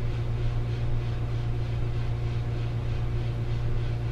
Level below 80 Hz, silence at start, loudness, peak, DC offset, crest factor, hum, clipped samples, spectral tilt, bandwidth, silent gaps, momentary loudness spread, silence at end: -32 dBFS; 0 s; -30 LUFS; -16 dBFS; under 0.1%; 10 dB; 60 Hz at -55 dBFS; under 0.1%; -8 dB/octave; 6.8 kHz; none; 1 LU; 0 s